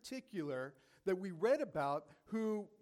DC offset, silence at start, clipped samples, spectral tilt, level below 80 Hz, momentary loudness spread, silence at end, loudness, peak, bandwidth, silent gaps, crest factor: under 0.1%; 0.05 s; under 0.1%; -6.5 dB/octave; -78 dBFS; 10 LU; 0.15 s; -40 LUFS; -24 dBFS; 15.5 kHz; none; 16 dB